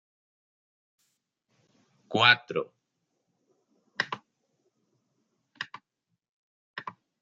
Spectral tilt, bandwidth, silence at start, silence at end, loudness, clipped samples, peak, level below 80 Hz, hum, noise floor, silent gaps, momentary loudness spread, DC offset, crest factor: -3.5 dB/octave; 7.8 kHz; 2.1 s; 0.3 s; -25 LUFS; under 0.1%; -4 dBFS; -80 dBFS; none; -82 dBFS; 6.29-6.74 s; 24 LU; under 0.1%; 30 dB